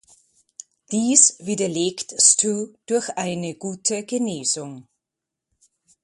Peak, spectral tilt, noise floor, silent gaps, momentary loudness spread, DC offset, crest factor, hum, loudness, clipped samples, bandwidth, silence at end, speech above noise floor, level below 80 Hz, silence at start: 0 dBFS; -2.5 dB/octave; -85 dBFS; none; 13 LU; under 0.1%; 24 dB; none; -20 LUFS; under 0.1%; 11.5 kHz; 1.2 s; 64 dB; -68 dBFS; 0.9 s